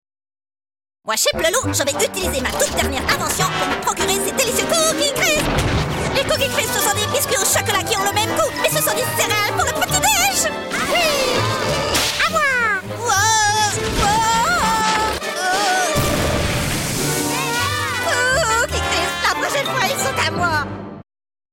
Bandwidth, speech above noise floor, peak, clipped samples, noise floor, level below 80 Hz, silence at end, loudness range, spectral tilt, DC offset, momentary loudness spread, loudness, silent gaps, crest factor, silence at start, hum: 17 kHz; over 72 dB; -6 dBFS; under 0.1%; under -90 dBFS; -36 dBFS; 0.5 s; 2 LU; -2.5 dB/octave; under 0.1%; 4 LU; -17 LUFS; none; 12 dB; 1.05 s; none